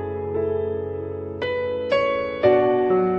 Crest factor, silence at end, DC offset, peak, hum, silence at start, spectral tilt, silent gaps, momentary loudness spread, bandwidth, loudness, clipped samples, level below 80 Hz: 16 dB; 0 s; under 0.1%; -6 dBFS; none; 0 s; -8 dB/octave; none; 10 LU; 6.6 kHz; -22 LUFS; under 0.1%; -54 dBFS